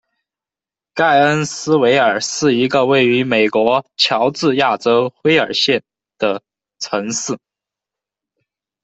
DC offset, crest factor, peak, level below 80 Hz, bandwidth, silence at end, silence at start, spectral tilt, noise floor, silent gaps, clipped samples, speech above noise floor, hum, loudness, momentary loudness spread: under 0.1%; 16 dB; 0 dBFS; -60 dBFS; 8.4 kHz; 1.45 s; 0.95 s; -4 dB/octave; -89 dBFS; none; under 0.1%; 75 dB; none; -15 LUFS; 9 LU